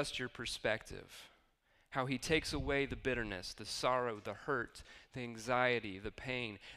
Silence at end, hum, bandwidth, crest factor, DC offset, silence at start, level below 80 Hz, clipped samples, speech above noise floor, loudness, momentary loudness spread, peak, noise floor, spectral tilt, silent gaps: 0 s; none; 15.5 kHz; 22 dB; under 0.1%; 0 s; -56 dBFS; under 0.1%; 34 dB; -38 LUFS; 13 LU; -18 dBFS; -73 dBFS; -4 dB/octave; none